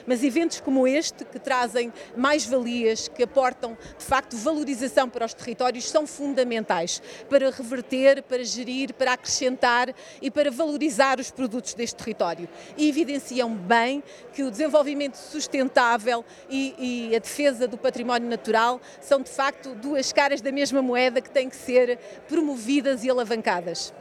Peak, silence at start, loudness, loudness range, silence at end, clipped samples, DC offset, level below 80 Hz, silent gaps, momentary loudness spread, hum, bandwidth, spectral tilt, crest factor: -4 dBFS; 0 s; -24 LUFS; 2 LU; 0 s; under 0.1%; under 0.1%; -62 dBFS; none; 9 LU; none; 14 kHz; -3 dB/octave; 20 dB